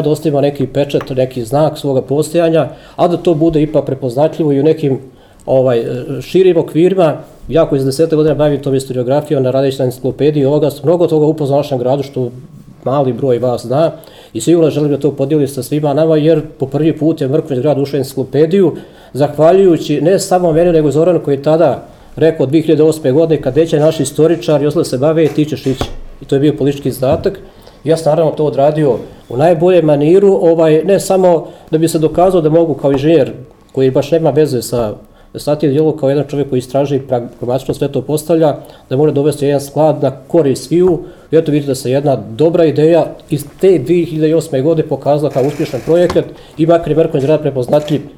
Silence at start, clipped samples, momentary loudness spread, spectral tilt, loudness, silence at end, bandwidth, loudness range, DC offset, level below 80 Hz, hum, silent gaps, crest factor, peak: 0 s; under 0.1%; 8 LU; -7 dB/octave; -12 LUFS; 0.05 s; 16 kHz; 4 LU; under 0.1%; -40 dBFS; none; none; 12 dB; 0 dBFS